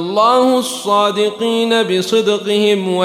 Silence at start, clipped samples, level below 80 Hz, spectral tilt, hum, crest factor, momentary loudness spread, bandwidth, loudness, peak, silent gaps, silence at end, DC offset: 0 s; under 0.1%; -68 dBFS; -4 dB/octave; none; 12 dB; 4 LU; 15.5 kHz; -14 LUFS; -2 dBFS; none; 0 s; under 0.1%